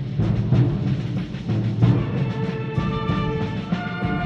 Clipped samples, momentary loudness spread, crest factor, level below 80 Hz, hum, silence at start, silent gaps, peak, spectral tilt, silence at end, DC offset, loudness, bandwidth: under 0.1%; 7 LU; 18 dB; -38 dBFS; none; 0 s; none; -4 dBFS; -9 dB/octave; 0 s; under 0.1%; -23 LUFS; 6.6 kHz